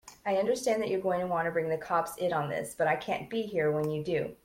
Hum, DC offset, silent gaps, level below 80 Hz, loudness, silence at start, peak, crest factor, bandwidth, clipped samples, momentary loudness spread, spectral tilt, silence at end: none; under 0.1%; none; -66 dBFS; -31 LUFS; 0.05 s; -14 dBFS; 16 dB; 16.5 kHz; under 0.1%; 4 LU; -5.5 dB/octave; 0.1 s